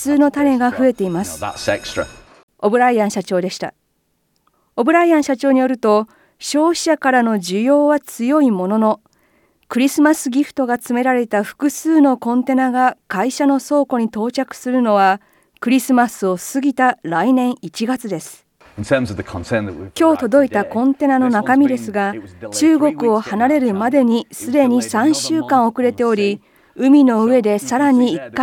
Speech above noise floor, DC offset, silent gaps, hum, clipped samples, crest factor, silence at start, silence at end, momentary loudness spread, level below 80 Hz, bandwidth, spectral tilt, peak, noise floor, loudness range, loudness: 50 dB; under 0.1%; 2.43-2.48 s; none; under 0.1%; 14 dB; 0 s; 0 s; 9 LU; -56 dBFS; 17.5 kHz; -5 dB/octave; -2 dBFS; -66 dBFS; 4 LU; -16 LUFS